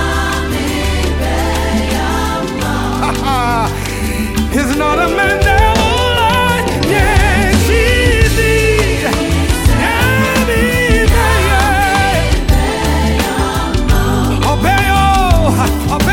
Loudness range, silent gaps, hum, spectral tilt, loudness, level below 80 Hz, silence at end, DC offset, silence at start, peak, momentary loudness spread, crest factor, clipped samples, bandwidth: 4 LU; none; none; -5 dB/octave; -12 LUFS; -18 dBFS; 0 s; under 0.1%; 0 s; 0 dBFS; 5 LU; 12 dB; under 0.1%; 17 kHz